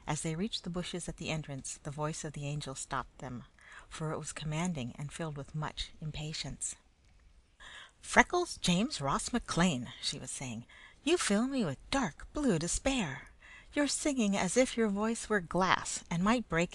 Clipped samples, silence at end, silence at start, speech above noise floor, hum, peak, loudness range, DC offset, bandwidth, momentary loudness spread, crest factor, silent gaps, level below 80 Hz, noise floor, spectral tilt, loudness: under 0.1%; 0 s; 0 s; 29 dB; none; -6 dBFS; 8 LU; under 0.1%; 12.5 kHz; 15 LU; 28 dB; none; -52 dBFS; -63 dBFS; -4 dB/octave; -34 LUFS